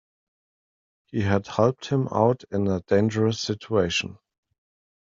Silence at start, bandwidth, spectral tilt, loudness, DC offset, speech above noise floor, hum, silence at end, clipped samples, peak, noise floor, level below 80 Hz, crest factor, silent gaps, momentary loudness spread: 1.15 s; 7.8 kHz; -6 dB/octave; -24 LUFS; under 0.1%; over 67 dB; none; 0.9 s; under 0.1%; -4 dBFS; under -90 dBFS; -60 dBFS; 20 dB; none; 6 LU